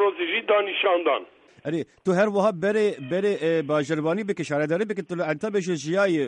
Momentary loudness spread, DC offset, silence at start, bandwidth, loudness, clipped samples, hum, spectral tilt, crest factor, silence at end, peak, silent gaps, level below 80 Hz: 7 LU; under 0.1%; 0 s; 9.6 kHz; -24 LUFS; under 0.1%; none; -5.5 dB/octave; 16 dB; 0 s; -8 dBFS; none; -72 dBFS